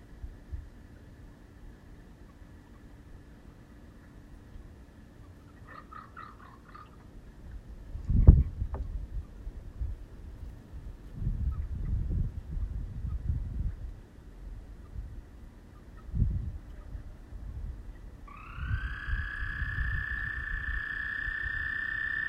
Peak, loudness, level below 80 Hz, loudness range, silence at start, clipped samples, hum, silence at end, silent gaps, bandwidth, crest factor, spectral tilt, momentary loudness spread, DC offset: -2 dBFS; -33 LUFS; -36 dBFS; 22 LU; 0 s; under 0.1%; none; 0 s; none; 5.4 kHz; 30 dB; -8 dB/octave; 21 LU; under 0.1%